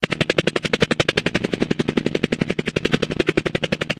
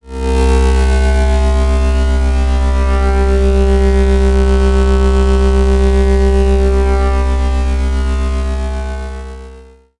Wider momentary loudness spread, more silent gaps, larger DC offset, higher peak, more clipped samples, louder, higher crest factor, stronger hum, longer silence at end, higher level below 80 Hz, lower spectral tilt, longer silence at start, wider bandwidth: second, 4 LU vs 7 LU; neither; second, under 0.1% vs 5%; about the same, 0 dBFS vs -2 dBFS; neither; second, -21 LUFS vs -13 LUFS; first, 20 dB vs 10 dB; neither; about the same, 0.05 s vs 0 s; second, -44 dBFS vs -12 dBFS; second, -5 dB/octave vs -7 dB/octave; about the same, 0 s vs 0 s; first, 14 kHz vs 11 kHz